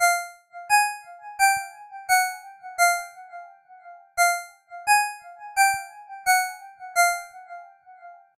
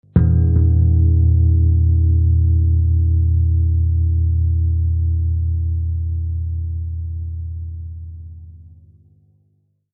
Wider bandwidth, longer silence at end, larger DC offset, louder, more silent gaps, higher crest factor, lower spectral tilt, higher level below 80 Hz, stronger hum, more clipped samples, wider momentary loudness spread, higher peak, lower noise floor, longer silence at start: first, 16 kHz vs 1.7 kHz; second, 0.25 s vs 1.3 s; neither; second, -23 LUFS vs -17 LUFS; neither; about the same, 18 dB vs 16 dB; second, 3 dB/octave vs -14.5 dB/octave; second, -68 dBFS vs -22 dBFS; second, none vs 50 Hz at -45 dBFS; neither; first, 21 LU vs 14 LU; second, -8 dBFS vs -2 dBFS; second, -47 dBFS vs -63 dBFS; second, 0 s vs 0.15 s